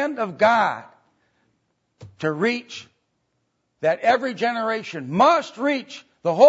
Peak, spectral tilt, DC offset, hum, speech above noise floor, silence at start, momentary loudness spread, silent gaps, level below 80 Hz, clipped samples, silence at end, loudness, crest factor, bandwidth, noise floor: -2 dBFS; -5.5 dB/octave; under 0.1%; none; 51 dB; 0 s; 12 LU; none; -70 dBFS; under 0.1%; 0 s; -22 LUFS; 20 dB; 8 kHz; -72 dBFS